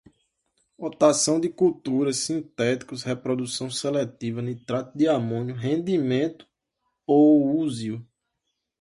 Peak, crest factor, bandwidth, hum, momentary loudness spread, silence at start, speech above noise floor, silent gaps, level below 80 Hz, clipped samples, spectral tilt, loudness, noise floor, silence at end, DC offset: -6 dBFS; 20 dB; 11.5 kHz; none; 12 LU; 0.8 s; 56 dB; none; -66 dBFS; under 0.1%; -5 dB/octave; -24 LUFS; -80 dBFS; 0.8 s; under 0.1%